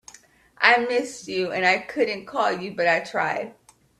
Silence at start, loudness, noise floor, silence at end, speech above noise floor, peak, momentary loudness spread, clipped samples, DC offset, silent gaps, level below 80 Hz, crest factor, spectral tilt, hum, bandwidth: 0.6 s; -22 LUFS; -53 dBFS; 0.5 s; 30 dB; 0 dBFS; 10 LU; under 0.1%; under 0.1%; none; -68 dBFS; 24 dB; -3.5 dB/octave; none; 13 kHz